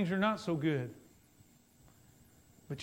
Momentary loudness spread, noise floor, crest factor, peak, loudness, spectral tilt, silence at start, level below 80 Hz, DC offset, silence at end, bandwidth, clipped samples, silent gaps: 15 LU; -64 dBFS; 20 dB; -18 dBFS; -35 LUFS; -6.5 dB/octave; 0 s; -72 dBFS; under 0.1%; 0 s; 16 kHz; under 0.1%; none